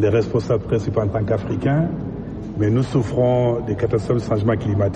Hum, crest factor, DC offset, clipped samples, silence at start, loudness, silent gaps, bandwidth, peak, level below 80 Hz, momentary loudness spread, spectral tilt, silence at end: none; 14 dB; under 0.1%; under 0.1%; 0 s; -20 LUFS; none; 8.8 kHz; -6 dBFS; -40 dBFS; 5 LU; -8.5 dB/octave; 0 s